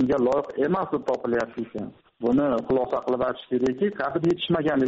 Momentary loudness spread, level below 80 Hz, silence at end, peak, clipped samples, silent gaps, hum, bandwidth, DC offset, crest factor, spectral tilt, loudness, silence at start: 8 LU; -54 dBFS; 0 s; -12 dBFS; under 0.1%; none; none; 7.8 kHz; under 0.1%; 12 dB; -5 dB/octave; -25 LUFS; 0 s